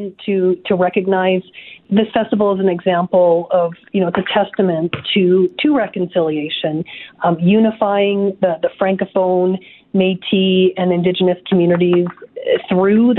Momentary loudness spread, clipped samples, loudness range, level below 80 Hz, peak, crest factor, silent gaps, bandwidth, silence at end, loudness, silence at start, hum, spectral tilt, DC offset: 7 LU; under 0.1%; 1 LU; -58 dBFS; 0 dBFS; 16 dB; none; 4.1 kHz; 0 s; -16 LUFS; 0 s; none; -11 dB/octave; under 0.1%